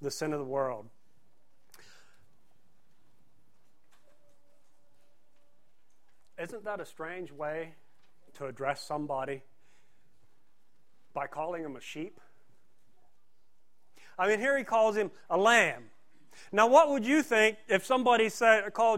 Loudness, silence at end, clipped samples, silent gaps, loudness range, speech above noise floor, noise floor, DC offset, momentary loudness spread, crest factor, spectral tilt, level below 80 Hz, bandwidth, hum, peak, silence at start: -28 LUFS; 0 s; under 0.1%; none; 17 LU; 48 dB; -77 dBFS; 0.3%; 19 LU; 24 dB; -3.5 dB/octave; -76 dBFS; 16 kHz; none; -8 dBFS; 0 s